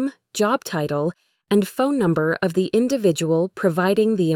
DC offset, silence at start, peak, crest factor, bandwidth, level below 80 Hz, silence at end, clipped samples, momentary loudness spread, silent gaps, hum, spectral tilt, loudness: under 0.1%; 0 s; -6 dBFS; 14 dB; 18 kHz; -60 dBFS; 0 s; under 0.1%; 5 LU; none; none; -6 dB/octave; -21 LUFS